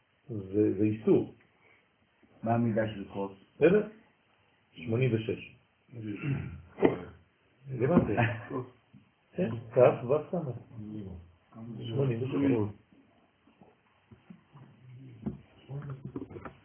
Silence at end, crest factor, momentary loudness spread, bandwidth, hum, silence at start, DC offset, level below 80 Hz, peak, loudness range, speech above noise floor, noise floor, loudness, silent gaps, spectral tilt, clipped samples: 0.15 s; 26 dB; 19 LU; 3.5 kHz; none; 0.3 s; under 0.1%; -58 dBFS; -6 dBFS; 7 LU; 39 dB; -68 dBFS; -31 LUFS; none; -7.5 dB/octave; under 0.1%